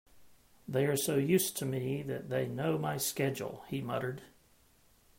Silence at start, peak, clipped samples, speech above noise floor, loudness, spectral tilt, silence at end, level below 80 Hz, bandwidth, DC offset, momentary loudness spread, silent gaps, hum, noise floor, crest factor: 0.15 s; -16 dBFS; under 0.1%; 33 dB; -34 LUFS; -5 dB/octave; 0.9 s; -68 dBFS; 16.5 kHz; under 0.1%; 10 LU; none; none; -66 dBFS; 18 dB